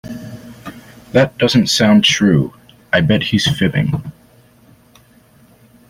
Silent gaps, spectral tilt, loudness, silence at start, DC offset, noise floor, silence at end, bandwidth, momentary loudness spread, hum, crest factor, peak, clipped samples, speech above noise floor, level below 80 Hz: none; -5 dB/octave; -14 LUFS; 0.05 s; under 0.1%; -48 dBFS; 1.8 s; 16 kHz; 23 LU; none; 16 dB; -2 dBFS; under 0.1%; 35 dB; -46 dBFS